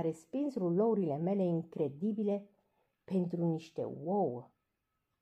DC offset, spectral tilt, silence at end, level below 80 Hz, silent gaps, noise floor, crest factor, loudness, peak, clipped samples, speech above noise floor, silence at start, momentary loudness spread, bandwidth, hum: under 0.1%; -9.5 dB/octave; 0.75 s; -82 dBFS; none; -84 dBFS; 14 dB; -35 LUFS; -22 dBFS; under 0.1%; 50 dB; 0 s; 7 LU; 9.2 kHz; none